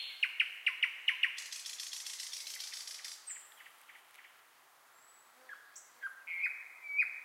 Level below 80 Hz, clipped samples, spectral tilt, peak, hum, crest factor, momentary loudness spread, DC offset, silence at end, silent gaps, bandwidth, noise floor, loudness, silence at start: under -90 dBFS; under 0.1%; 5.5 dB/octave; -18 dBFS; none; 24 dB; 23 LU; under 0.1%; 0 s; none; 16 kHz; -64 dBFS; -37 LUFS; 0 s